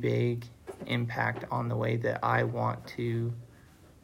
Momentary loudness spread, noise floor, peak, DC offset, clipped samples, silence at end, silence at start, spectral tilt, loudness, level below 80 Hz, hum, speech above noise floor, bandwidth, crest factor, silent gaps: 10 LU; -56 dBFS; -12 dBFS; under 0.1%; under 0.1%; 0.2 s; 0 s; -7.5 dB/octave; -31 LUFS; -62 dBFS; none; 25 dB; 11.5 kHz; 20 dB; none